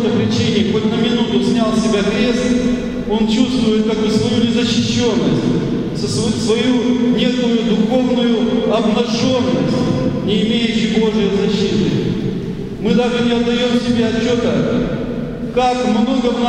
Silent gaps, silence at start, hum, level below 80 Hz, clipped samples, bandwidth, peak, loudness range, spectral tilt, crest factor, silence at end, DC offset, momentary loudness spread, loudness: none; 0 s; none; -38 dBFS; under 0.1%; 10.5 kHz; 0 dBFS; 1 LU; -6 dB/octave; 14 dB; 0 s; under 0.1%; 4 LU; -16 LUFS